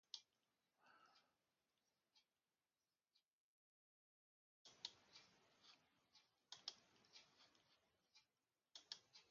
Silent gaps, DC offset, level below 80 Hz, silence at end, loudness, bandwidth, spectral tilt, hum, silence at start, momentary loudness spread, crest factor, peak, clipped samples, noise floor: 3.26-4.65 s; under 0.1%; under -90 dBFS; 0 s; -60 LUFS; 7.2 kHz; 1.5 dB/octave; none; 0.05 s; 12 LU; 34 dB; -34 dBFS; under 0.1%; under -90 dBFS